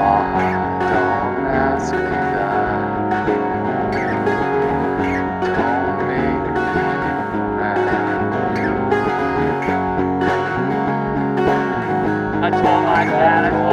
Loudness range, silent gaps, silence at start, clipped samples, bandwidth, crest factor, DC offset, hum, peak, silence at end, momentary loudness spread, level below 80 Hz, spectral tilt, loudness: 1 LU; none; 0 s; under 0.1%; 9.6 kHz; 16 dB; under 0.1%; none; 0 dBFS; 0 s; 5 LU; -40 dBFS; -7.5 dB/octave; -18 LUFS